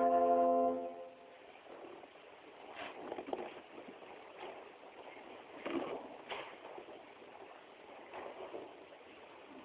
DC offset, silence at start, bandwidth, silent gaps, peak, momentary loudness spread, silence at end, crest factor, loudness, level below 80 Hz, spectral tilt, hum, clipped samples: under 0.1%; 0 s; 4 kHz; none; -22 dBFS; 22 LU; 0 s; 20 dB; -39 LUFS; -80 dBFS; -2.5 dB/octave; none; under 0.1%